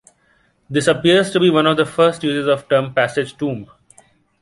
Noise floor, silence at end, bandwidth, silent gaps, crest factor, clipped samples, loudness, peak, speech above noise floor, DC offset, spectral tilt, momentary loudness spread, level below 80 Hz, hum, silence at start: -59 dBFS; 0.75 s; 11.5 kHz; none; 16 dB; under 0.1%; -16 LUFS; -2 dBFS; 43 dB; under 0.1%; -5 dB/octave; 10 LU; -56 dBFS; none; 0.7 s